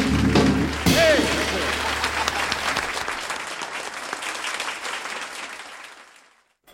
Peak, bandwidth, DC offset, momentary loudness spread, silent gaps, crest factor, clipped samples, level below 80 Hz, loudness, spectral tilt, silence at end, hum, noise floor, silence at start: -4 dBFS; 16.5 kHz; under 0.1%; 15 LU; none; 20 dB; under 0.1%; -38 dBFS; -23 LUFS; -4 dB/octave; 0.7 s; none; -57 dBFS; 0 s